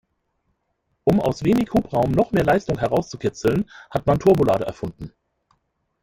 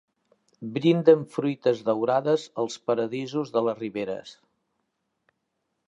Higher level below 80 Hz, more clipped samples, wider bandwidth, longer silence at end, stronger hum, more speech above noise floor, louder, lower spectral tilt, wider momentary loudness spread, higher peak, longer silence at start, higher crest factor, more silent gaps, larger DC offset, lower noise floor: first, -44 dBFS vs -76 dBFS; neither; first, 16.5 kHz vs 8 kHz; second, 0.95 s vs 1.55 s; neither; about the same, 52 dB vs 54 dB; first, -21 LUFS vs -25 LUFS; about the same, -7.5 dB/octave vs -6.5 dB/octave; about the same, 11 LU vs 12 LU; about the same, -4 dBFS vs -4 dBFS; first, 1.05 s vs 0.6 s; about the same, 18 dB vs 22 dB; neither; neither; second, -72 dBFS vs -78 dBFS